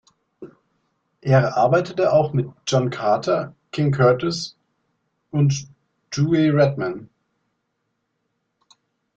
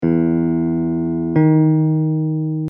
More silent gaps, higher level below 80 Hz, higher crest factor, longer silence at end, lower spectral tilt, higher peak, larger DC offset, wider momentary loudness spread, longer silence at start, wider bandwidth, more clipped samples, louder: neither; second, -58 dBFS vs -48 dBFS; first, 18 dB vs 12 dB; first, 2.1 s vs 0 s; second, -6.5 dB/octave vs -13.5 dB/octave; about the same, -4 dBFS vs -4 dBFS; neither; first, 11 LU vs 6 LU; first, 0.4 s vs 0 s; first, 8 kHz vs 2.6 kHz; neither; second, -20 LUFS vs -17 LUFS